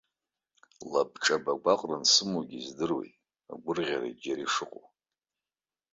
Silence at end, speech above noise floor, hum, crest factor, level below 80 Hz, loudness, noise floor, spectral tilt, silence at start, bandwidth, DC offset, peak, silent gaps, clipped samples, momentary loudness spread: 1.25 s; over 60 dB; none; 22 dB; -74 dBFS; -29 LUFS; under -90 dBFS; -2 dB/octave; 0.8 s; 8.4 kHz; under 0.1%; -10 dBFS; none; under 0.1%; 19 LU